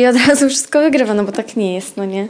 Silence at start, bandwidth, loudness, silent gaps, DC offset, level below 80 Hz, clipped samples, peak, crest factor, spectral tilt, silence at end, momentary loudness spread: 0 s; 10.5 kHz; -14 LUFS; none; under 0.1%; -56 dBFS; under 0.1%; -2 dBFS; 12 dB; -3.5 dB/octave; 0 s; 10 LU